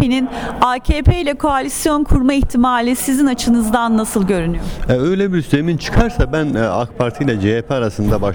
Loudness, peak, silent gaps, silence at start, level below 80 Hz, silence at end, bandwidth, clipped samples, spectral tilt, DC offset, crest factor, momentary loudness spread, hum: -16 LUFS; 0 dBFS; none; 0 s; -24 dBFS; 0 s; over 20 kHz; under 0.1%; -6 dB/octave; under 0.1%; 14 dB; 4 LU; none